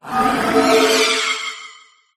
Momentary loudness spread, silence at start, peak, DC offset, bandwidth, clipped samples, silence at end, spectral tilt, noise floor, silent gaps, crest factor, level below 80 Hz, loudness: 12 LU; 0.05 s; 0 dBFS; under 0.1%; 15.5 kHz; under 0.1%; 0.45 s; -2 dB/octave; -45 dBFS; none; 16 dB; -50 dBFS; -15 LUFS